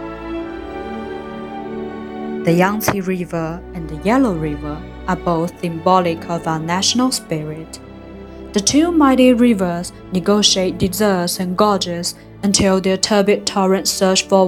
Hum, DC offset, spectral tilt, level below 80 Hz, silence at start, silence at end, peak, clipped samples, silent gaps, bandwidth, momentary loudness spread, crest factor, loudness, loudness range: none; under 0.1%; -4 dB/octave; -40 dBFS; 0 s; 0 s; 0 dBFS; under 0.1%; none; 17 kHz; 15 LU; 16 dB; -17 LUFS; 6 LU